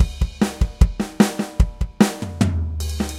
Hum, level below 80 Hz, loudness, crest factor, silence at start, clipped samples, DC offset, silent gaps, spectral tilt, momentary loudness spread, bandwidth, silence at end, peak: none; -24 dBFS; -21 LUFS; 20 dB; 0 s; under 0.1%; under 0.1%; none; -6 dB/octave; 4 LU; 16 kHz; 0 s; 0 dBFS